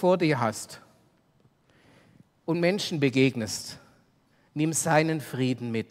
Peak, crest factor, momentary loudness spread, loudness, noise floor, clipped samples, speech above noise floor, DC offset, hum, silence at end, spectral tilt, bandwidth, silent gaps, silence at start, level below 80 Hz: -6 dBFS; 22 dB; 17 LU; -26 LUFS; -65 dBFS; under 0.1%; 39 dB; under 0.1%; none; 0.05 s; -5 dB/octave; 16 kHz; none; 0 s; -68 dBFS